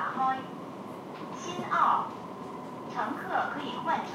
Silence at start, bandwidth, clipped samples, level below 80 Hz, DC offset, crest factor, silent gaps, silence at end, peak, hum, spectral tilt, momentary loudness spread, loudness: 0 s; 16 kHz; under 0.1%; -74 dBFS; under 0.1%; 20 dB; none; 0 s; -12 dBFS; none; -4.5 dB/octave; 15 LU; -32 LUFS